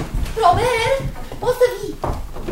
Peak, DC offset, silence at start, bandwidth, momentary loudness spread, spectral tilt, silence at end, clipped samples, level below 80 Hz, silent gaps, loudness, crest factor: 0 dBFS; under 0.1%; 0 s; 16.5 kHz; 11 LU; -5 dB/octave; 0 s; under 0.1%; -28 dBFS; none; -19 LUFS; 18 dB